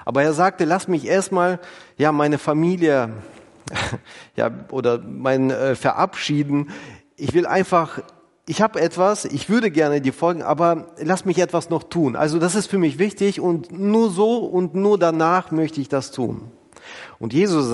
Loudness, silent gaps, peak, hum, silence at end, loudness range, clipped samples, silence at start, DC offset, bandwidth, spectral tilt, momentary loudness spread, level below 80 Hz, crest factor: -20 LUFS; none; -2 dBFS; none; 0 s; 3 LU; under 0.1%; 0 s; under 0.1%; 11.5 kHz; -6 dB/octave; 11 LU; -58 dBFS; 18 dB